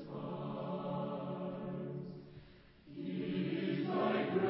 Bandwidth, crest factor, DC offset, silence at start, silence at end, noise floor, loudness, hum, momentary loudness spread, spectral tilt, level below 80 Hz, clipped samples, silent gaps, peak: 5.6 kHz; 18 dB; under 0.1%; 0 s; 0 s; -59 dBFS; -39 LUFS; none; 16 LU; -6 dB/octave; -72 dBFS; under 0.1%; none; -20 dBFS